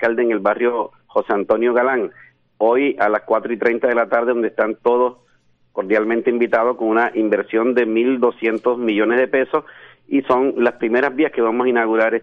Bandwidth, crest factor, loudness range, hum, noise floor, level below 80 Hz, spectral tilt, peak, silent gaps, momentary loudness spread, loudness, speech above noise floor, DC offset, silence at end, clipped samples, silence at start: 5.2 kHz; 14 dB; 1 LU; none; -58 dBFS; -64 dBFS; -7.5 dB/octave; -4 dBFS; none; 5 LU; -18 LUFS; 41 dB; under 0.1%; 0 s; under 0.1%; 0 s